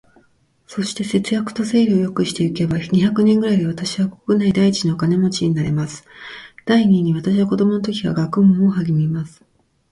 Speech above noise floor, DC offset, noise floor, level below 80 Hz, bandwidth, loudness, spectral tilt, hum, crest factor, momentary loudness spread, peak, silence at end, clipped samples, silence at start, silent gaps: 42 dB; under 0.1%; -59 dBFS; -52 dBFS; 11.5 kHz; -18 LUFS; -6.5 dB/octave; none; 14 dB; 11 LU; -4 dBFS; 0.65 s; under 0.1%; 0.7 s; none